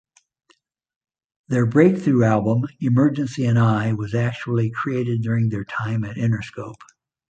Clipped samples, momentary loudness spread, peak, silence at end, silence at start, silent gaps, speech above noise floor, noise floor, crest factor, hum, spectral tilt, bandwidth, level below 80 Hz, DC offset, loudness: under 0.1%; 9 LU; -2 dBFS; 0.55 s; 1.5 s; none; 43 dB; -63 dBFS; 18 dB; none; -8.5 dB/octave; 8 kHz; -54 dBFS; under 0.1%; -20 LUFS